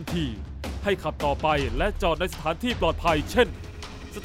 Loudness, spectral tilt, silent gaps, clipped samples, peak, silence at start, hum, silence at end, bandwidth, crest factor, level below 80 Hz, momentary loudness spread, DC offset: -26 LUFS; -5.5 dB/octave; none; under 0.1%; -8 dBFS; 0 s; none; 0 s; 16 kHz; 18 dB; -36 dBFS; 13 LU; under 0.1%